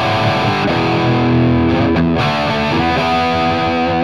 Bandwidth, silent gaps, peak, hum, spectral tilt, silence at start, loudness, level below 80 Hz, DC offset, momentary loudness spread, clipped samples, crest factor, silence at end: 13 kHz; none; -4 dBFS; none; -7 dB/octave; 0 s; -14 LUFS; -34 dBFS; 0.7%; 2 LU; under 0.1%; 10 dB; 0 s